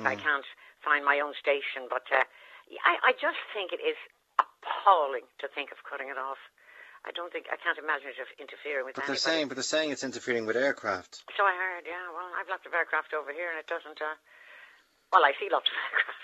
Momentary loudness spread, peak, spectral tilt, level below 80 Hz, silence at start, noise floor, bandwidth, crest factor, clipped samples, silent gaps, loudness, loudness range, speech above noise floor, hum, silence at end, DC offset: 14 LU; -6 dBFS; -2 dB/octave; -82 dBFS; 0 s; -58 dBFS; 13 kHz; 26 dB; under 0.1%; none; -29 LUFS; 7 LU; 27 dB; none; 0 s; under 0.1%